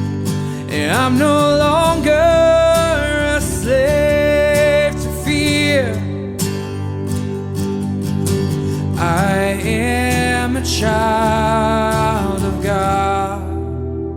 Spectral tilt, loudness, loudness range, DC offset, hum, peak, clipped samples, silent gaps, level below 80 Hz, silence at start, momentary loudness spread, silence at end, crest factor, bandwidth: -5.5 dB/octave; -16 LUFS; 5 LU; under 0.1%; none; -2 dBFS; under 0.1%; none; -30 dBFS; 0 s; 9 LU; 0 s; 14 dB; 17.5 kHz